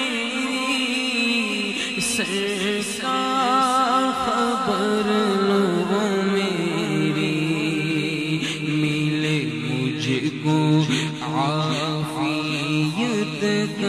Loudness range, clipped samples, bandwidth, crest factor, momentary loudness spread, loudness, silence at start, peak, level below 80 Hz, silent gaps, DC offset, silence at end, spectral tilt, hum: 2 LU; under 0.1%; 14.5 kHz; 14 dB; 5 LU; -22 LUFS; 0 s; -8 dBFS; -60 dBFS; none; under 0.1%; 0 s; -4.5 dB/octave; none